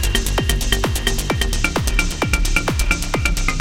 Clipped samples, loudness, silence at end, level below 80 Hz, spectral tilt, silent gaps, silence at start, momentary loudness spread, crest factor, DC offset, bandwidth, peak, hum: under 0.1%; -19 LUFS; 0 s; -20 dBFS; -3.5 dB/octave; none; 0 s; 2 LU; 18 dB; under 0.1%; 17 kHz; 0 dBFS; none